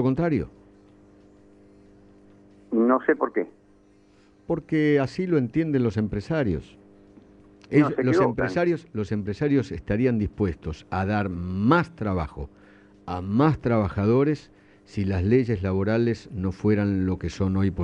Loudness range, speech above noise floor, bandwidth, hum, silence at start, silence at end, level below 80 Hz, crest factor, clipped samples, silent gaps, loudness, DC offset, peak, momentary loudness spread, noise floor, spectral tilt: 4 LU; 33 dB; 8.8 kHz; 50 Hz at -50 dBFS; 0 s; 0 s; -46 dBFS; 18 dB; under 0.1%; none; -24 LUFS; under 0.1%; -6 dBFS; 9 LU; -57 dBFS; -8.5 dB/octave